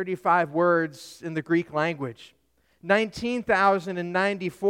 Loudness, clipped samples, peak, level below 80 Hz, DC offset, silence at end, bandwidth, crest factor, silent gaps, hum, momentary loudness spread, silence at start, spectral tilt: -25 LUFS; under 0.1%; -6 dBFS; -62 dBFS; under 0.1%; 0 s; 15.5 kHz; 18 dB; none; none; 12 LU; 0 s; -6 dB/octave